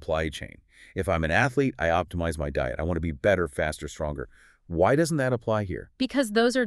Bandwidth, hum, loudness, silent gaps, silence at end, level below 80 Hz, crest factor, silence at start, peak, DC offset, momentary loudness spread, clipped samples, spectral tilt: 13.5 kHz; none; -26 LUFS; none; 0 s; -42 dBFS; 18 dB; 0 s; -8 dBFS; under 0.1%; 11 LU; under 0.1%; -5.5 dB/octave